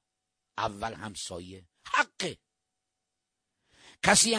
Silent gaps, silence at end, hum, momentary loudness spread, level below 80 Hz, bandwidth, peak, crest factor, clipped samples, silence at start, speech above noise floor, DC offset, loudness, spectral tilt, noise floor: none; 0 s; none; 23 LU; -60 dBFS; 10.5 kHz; -4 dBFS; 28 dB; under 0.1%; 0.6 s; 56 dB; under 0.1%; -29 LUFS; -1.5 dB/octave; -85 dBFS